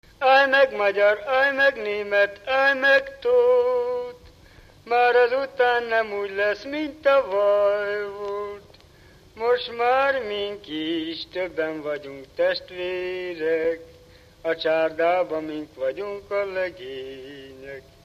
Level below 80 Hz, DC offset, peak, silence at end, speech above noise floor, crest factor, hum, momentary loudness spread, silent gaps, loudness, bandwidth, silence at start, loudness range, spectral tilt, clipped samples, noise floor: -58 dBFS; under 0.1%; -6 dBFS; 0.25 s; 29 dB; 18 dB; none; 15 LU; none; -22 LUFS; 13.5 kHz; 0.2 s; 7 LU; -4.5 dB/octave; under 0.1%; -51 dBFS